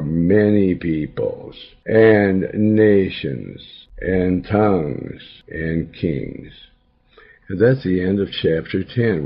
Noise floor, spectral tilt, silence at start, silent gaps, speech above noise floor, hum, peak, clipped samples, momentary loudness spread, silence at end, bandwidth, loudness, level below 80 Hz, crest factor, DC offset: -53 dBFS; -11 dB/octave; 0 s; none; 34 dB; none; -2 dBFS; under 0.1%; 19 LU; 0 s; 5.6 kHz; -18 LUFS; -44 dBFS; 18 dB; under 0.1%